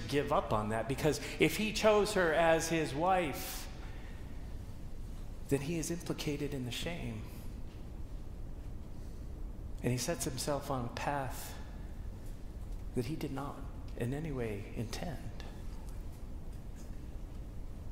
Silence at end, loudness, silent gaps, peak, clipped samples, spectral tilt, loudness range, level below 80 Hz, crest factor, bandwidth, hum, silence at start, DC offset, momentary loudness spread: 0 s; -35 LUFS; none; -14 dBFS; under 0.1%; -5 dB/octave; 12 LU; -46 dBFS; 24 dB; 16 kHz; none; 0 s; under 0.1%; 18 LU